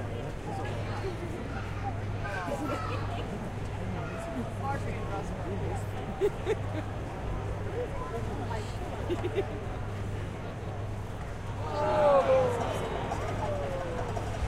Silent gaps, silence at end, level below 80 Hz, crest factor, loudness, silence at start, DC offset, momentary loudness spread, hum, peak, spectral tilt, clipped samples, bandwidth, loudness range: none; 0 s; -42 dBFS; 20 dB; -33 LUFS; 0 s; under 0.1%; 8 LU; none; -12 dBFS; -6.5 dB/octave; under 0.1%; 13.5 kHz; 6 LU